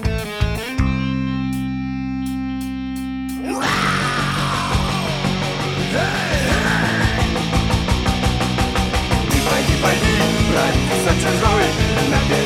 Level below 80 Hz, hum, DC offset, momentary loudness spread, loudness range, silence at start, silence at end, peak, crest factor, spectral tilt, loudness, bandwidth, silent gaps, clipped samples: -26 dBFS; none; under 0.1%; 8 LU; 6 LU; 0 s; 0 s; -2 dBFS; 16 dB; -5 dB/octave; -19 LUFS; 17 kHz; none; under 0.1%